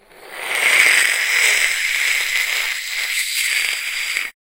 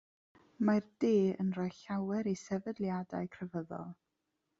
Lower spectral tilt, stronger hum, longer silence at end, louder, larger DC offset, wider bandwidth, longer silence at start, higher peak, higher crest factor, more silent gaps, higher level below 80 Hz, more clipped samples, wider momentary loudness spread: second, 3 dB/octave vs -7.5 dB/octave; neither; second, 0.1 s vs 0.65 s; first, -16 LUFS vs -35 LUFS; neither; first, 16 kHz vs 7.8 kHz; second, 0.2 s vs 0.6 s; first, 0 dBFS vs -16 dBFS; about the same, 18 dB vs 18 dB; neither; first, -56 dBFS vs -74 dBFS; neither; second, 9 LU vs 12 LU